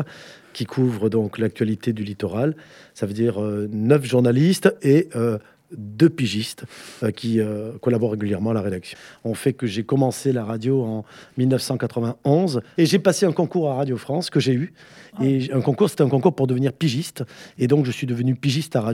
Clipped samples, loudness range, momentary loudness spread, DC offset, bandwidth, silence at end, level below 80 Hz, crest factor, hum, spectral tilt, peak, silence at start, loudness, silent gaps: under 0.1%; 4 LU; 14 LU; under 0.1%; 16 kHz; 0 s; -66 dBFS; 20 dB; none; -6.5 dB/octave; -2 dBFS; 0 s; -21 LUFS; none